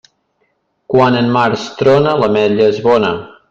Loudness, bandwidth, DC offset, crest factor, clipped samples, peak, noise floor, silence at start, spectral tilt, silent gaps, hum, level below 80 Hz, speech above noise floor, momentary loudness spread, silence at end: -12 LUFS; 7.6 kHz; under 0.1%; 12 dB; under 0.1%; 0 dBFS; -63 dBFS; 0.9 s; -6.5 dB/octave; none; none; -50 dBFS; 51 dB; 5 LU; 0.25 s